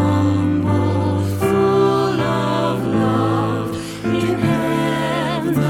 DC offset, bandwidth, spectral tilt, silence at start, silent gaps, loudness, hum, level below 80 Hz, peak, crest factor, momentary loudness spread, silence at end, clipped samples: under 0.1%; 17 kHz; -7 dB/octave; 0 s; none; -18 LUFS; none; -46 dBFS; -4 dBFS; 14 dB; 4 LU; 0 s; under 0.1%